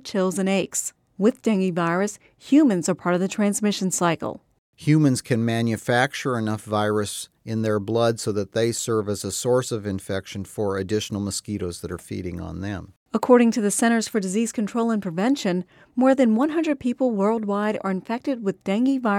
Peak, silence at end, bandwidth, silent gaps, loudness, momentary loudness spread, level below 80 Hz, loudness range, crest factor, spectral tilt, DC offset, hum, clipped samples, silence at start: -4 dBFS; 0 s; 16 kHz; 4.58-4.73 s, 12.96-13.06 s; -23 LUFS; 12 LU; -58 dBFS; 4 LU; 18 dB; -5 dB/octave; under 0.1%; none; under 0.1%; 0.05 s